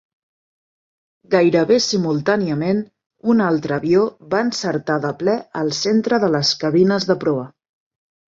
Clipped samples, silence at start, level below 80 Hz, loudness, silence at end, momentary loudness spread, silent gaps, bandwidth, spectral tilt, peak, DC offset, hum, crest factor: under 0.1%; 1.3 s; -60 dBFS; -18 LUFS; 0.85 s; 7 LU; 3.06-3.10 s; 7.8 kHz; -5 dB/octave; -2 dBFS; under 0.1%; none; 16 dB